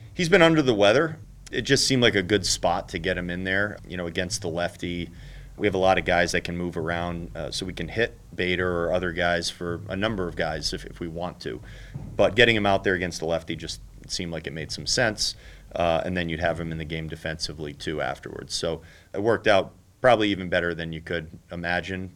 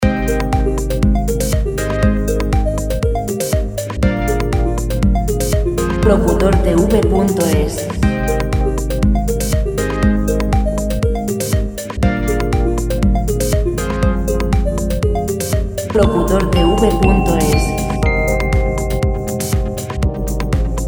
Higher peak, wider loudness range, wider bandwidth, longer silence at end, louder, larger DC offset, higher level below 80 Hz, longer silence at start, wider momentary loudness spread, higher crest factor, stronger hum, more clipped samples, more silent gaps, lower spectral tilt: about the same, -2 dBFS vs 0 dBFS; about the same, 5 LU vs 3 LU; second, 16.5 kHz vs over 20 kHz; about the same, 0.05 s vs 0 s; second, -25 LUFS vs -16 LUFS; neither; second, -46 dBFS vs -18 dBFS; about the same, 0 s vs 0 s; first, 14 LU vs 6 LU; first, 24 dB vs 14 dB; neither; neither; neither; second, -4 dB/octave vs -6 dB/octave